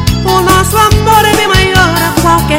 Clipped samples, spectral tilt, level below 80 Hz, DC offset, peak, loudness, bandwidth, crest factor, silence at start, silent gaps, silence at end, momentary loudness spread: 2%; -4 dB/octave; -20 dBFS; under 0.1%; 0 dBFS; -7 LUFS; 17.5 kHz; 8 dB; 0 s; none; 0 s; 3 LU